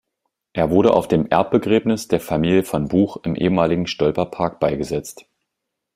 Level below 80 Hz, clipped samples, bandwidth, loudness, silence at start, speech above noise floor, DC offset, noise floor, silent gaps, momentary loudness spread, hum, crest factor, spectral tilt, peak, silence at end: -48 dBFS; under 0.1%; 16 kHz; -19 LUFS; 0.55 s; 61 dB; under 0.1%; -80 dBFS; none; 7 LU; none; 18 dB; -6.5 dB/octave; -2 dBFS; 0.85 s